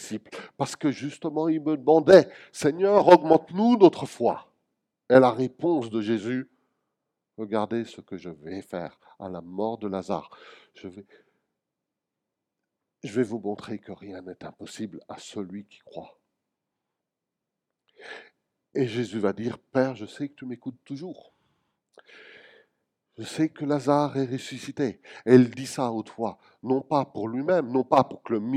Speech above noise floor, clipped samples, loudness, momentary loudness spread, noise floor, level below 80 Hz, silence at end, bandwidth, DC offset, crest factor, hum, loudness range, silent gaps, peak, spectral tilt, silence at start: 61 dB; under 0.1%; -24 LUFS; 23 LU; -86 dBFS; -72 dBFS; 0 s; 13 kHz; under 0.1%; 26 dB; none; 20 LU; none; 0 dBFS; -6.5 dB/octave; 0 s